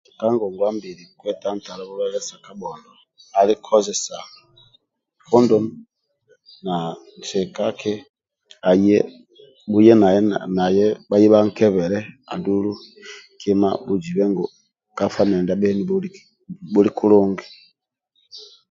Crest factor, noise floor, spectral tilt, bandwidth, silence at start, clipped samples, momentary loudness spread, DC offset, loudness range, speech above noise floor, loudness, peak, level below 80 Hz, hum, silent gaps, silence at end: 20 dB; -69 dBFS; -6 dB/octave; 7.8 kHz; 0.2 s; under 0.1%; 19 LU; under 0.1%; 7 LU; 50 dB; -19 LUFS; 0 dBFS; -58 dBFS; none; 8.09-8.14 s; 0.25 s